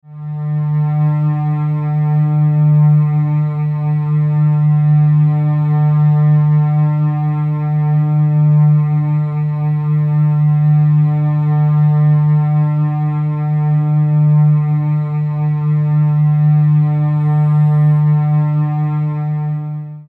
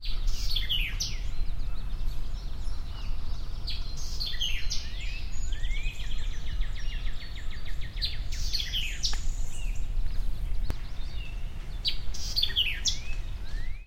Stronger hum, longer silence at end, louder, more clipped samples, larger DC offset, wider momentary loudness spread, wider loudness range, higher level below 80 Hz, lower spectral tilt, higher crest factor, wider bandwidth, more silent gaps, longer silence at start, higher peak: neither; about the same, 0.1 s vs 0.05 s; first, -14 LUFS vs -34 LUFS; neither; neither; second, 6 LU vs 11 LU; second, 1 LU vs 5 LU; second, -60 dBFS vs -30 dBFS; first, -12.5 dB/octave vs -2 dB/octave; second, 8 dB vs 14 dB; second, 2.7 kHz vs 14.5 kHz; neither; about the same, 0.1 s vs 0 s; first, -4 dBFS vs -12 dBFS